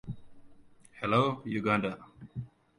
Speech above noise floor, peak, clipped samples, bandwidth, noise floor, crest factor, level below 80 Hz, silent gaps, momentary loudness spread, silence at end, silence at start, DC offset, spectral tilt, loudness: 26 dB; -12 dBFS; under 0.1%; 11 kHz; -56 dBFS; 20 dB; -62 dBFS; none; 18 LU; 0.3 s; 0.05 s; under 0.1%; -7 dB/octave; -30 LUFS